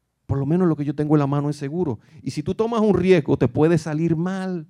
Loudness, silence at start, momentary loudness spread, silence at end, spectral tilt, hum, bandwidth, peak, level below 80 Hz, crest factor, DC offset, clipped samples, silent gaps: -21 LUFS; 0.3 s; 10 LU; 0.05 s; -8 dB/octave; none; 11 kHz; -4 dBFS; -50 dBFS; 16 dB; under 0.1%; under 0.1%; none